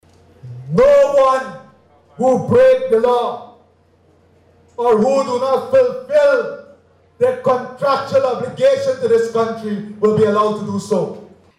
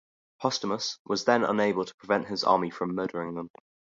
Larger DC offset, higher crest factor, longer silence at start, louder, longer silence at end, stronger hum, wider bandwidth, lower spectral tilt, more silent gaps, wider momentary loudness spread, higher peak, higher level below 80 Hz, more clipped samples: neither; second, 10 dB vs 22 dB; about the same, 0.45 s vs 0.4 s; first, -15 LUFS vs -28 LUFS; second, 0.35 s vs 0.5 s; neither; first, 11.5 kHz vs 7.8 kHz; first, -6 dB/octave vs -4.5 dB/octave; second, none vs 0.99-1.05 s, 1.94-1.98 s; first, 13 LU vs 10 LU; about the same, -6 dBFS vs -8 dBFS; first, -52 dBFS vs -70 dBFS; neither